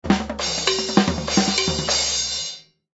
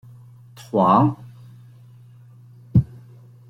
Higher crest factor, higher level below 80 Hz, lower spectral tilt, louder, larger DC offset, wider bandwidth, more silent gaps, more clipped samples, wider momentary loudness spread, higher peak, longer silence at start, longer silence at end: about the same, 22 dB vs 20 dB; first, -40 dBFS vs -46 dBFS; second, -3 dB/octave vs -9.5 dB/octave; about the same, -20 LUFS vs -19 LUFS; neither; second, 8.2 kHz vs 11 kHz; neither; neither; second, 6 LU vs 21 LU; first, 0 dBFS vs -4 dBFS; second, 0.05 s vs 0.75 s; second, 0.35 s vs 0.65 s